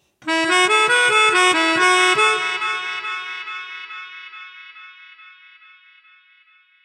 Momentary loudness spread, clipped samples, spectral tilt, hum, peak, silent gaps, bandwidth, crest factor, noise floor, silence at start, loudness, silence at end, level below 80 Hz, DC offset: 22 LU; under 0.1%; -0.5 dB/octave; none; -2 dBFS; none; 14 kHz; 18 dB; -55 dBFS; 0.25 s; -16 LUFS; 1.95 s; -72 dBFS; under 0.1%